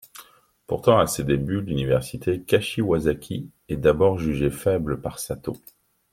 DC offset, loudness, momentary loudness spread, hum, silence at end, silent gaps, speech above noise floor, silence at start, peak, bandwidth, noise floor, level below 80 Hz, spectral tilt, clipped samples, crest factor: under 0.1%; -23 LUFS; 13 LU; none; 0.55 s; none; 29 dB; 0.15 s; -2 dBFS; 16.5 kHz; -52 dBFS; -44 dBFS; -6 dB/octave; under 0.1%; 22 dB